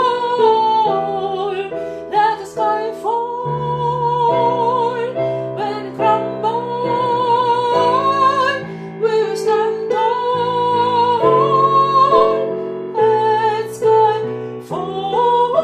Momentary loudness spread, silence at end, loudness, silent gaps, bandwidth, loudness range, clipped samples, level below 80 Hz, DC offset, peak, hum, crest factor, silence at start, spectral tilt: 9 LU; 0 s; -16 LUFS; none; 12 kHz; 4 LU; under 0.1%; -56 dBFS; under 0.1%; 0 dBFS; none; 16 dB; 0 s; -6 dB/octave